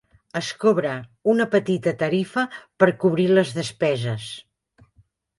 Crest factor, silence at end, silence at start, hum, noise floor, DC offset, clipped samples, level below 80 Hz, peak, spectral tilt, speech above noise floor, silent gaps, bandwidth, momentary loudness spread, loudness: 20 dB; 1 s; 0.35 s; none; -61 dBFS; under 0.1%; under 0.1%; -64 dBFS; -2 dBFS; -6 dB/octave; 39 dB; none; 11.5 kHz; 11 LU; -22 LUFS